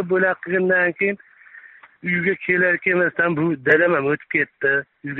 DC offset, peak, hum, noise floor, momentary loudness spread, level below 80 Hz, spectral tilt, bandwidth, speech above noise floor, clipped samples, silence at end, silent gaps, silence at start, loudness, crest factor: under 0.1%; -4 dBFS; none; -45 dBFS; 7 LU; -62 dBFS; -5 dB/octave; 4.1 kHz; 26 dB; under 0.1%; 0 s; none; 0 s; -19 LUFS; 16 dB